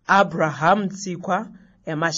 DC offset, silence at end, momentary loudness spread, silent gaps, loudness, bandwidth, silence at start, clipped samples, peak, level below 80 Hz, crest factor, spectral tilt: under 0.1%; 0 s; 15 LU; none; -21 LUFS; 8 kHz; 0.1 s; under 0.1%; -4 dBFS; -62 dBFS; 18 dB; -5 dB/octave